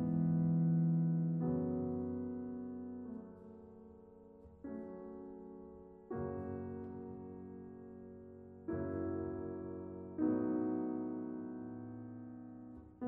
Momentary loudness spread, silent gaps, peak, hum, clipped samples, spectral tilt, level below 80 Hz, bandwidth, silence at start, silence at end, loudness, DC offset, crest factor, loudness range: 21 LU; none; -24 dBFS; none; under 0.1%; -10 dB/octave; -68 dBFS; 2.1 kHz; 0 s; 0 s; -40 LUFS; under 0.1%; 16 dB; 12 LU